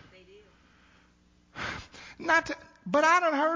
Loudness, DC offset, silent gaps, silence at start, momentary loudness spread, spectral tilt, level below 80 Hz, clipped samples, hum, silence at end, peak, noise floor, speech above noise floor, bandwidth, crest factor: -27 LUFS; under 0.1%; none; 1.55 s; 19 LU; -3.5 dB/octave; -60 dBFS; under 0.1%; none; 0 s; -10 dBFS; -63 dBFS; 38 dB; 7.6 kHz; 20 dB